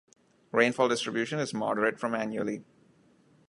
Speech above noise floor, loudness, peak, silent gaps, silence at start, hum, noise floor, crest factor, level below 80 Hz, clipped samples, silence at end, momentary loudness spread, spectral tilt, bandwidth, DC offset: 34 dB; -29 LUFS; -8 dBFS; none; 0.55 s; none; -63 dBFS; 22 dB; -76 dBFS; under 0.1%; 0.85 s; 9 LU; -4.5 dB/octave; 11.5 kHz; under 0.1%